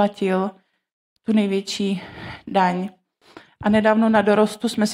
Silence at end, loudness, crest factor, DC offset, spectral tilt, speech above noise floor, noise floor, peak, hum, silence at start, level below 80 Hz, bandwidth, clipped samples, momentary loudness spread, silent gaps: 0 s; -20 LUFS; 18 dB; under 0.1%; -5.5 dB/octave; 29 dB; -48 dBFS; -4 dBFS; none; 0 s; -56 dBFS; 12.5 kHz; under 0.1%; 14 LU; 0.92-1.16 s